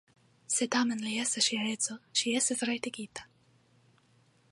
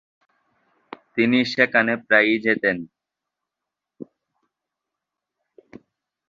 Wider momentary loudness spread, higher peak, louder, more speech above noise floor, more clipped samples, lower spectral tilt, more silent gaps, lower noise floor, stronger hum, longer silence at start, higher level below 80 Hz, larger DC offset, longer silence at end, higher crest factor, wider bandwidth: about the same, 11 LU vs 13 LU; second, -14 dBFS vs -2 dBFS; second, -30 LUFS vs -19 LUFS; second, 35 dB vs 66 dB; neither; second, -1.5 dB/octave vs -5.5 dB/octave; neither; second, -66 dBFS vs -85 dBFS; neither; second, 0.5 s vs 1.15 s; second, -78 dBFS vs -66 dBFS; neither; second, 1.25 s vs 2.25 s; about the same, 20 dB vs 22 dB; first, 11.5 kHz vs 7.4 kHz